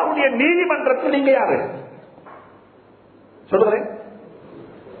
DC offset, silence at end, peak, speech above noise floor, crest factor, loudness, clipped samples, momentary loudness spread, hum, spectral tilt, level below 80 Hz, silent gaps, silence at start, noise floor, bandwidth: under 0.1%; 0 s; -4 dBFS; 32 dB; 18 dB; -18 LUFS; under 0.1%; 24 LU; none; -10 dB/octave; -66 dBFS; none; 0 s; -49 dBFS; 4.5 kHz